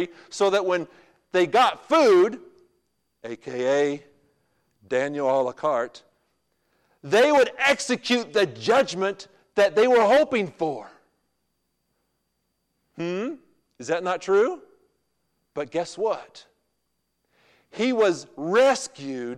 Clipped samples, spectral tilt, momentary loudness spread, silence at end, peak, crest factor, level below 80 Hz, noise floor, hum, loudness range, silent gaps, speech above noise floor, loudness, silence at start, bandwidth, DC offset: under 0.1%; -4 dB/octave; 16 LU; 0 s; -10 dBFS; 14 dB; -70 dBFS; -76 dBFS; none; 10 LU; none; 54 dB; -23 LUFS; 0 s; 13.5 kHz; under 0.1%